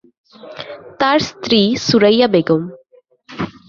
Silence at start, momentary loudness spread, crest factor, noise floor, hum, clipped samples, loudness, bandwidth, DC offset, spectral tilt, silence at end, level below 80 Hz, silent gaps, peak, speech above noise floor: 0.45 s; 20 LU; 16 dB; -52 dBFS; none; under 0.1%; -14 LUFS; 7.2 kHz; under 0.1%; -5 dB/octave; 0.2 s; -52 dBFS; none; 0 dBFS; 38 dB